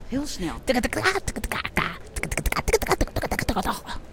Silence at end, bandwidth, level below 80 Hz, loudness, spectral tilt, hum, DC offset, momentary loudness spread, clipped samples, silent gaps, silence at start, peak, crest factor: 0 s; 17 kHz; -34 dBFS; -26 LUFS; -4 dB/octave; none; under 0.1%; 7 LU; under 0.1%; none; 0 s; -6 dBFS; 20 dB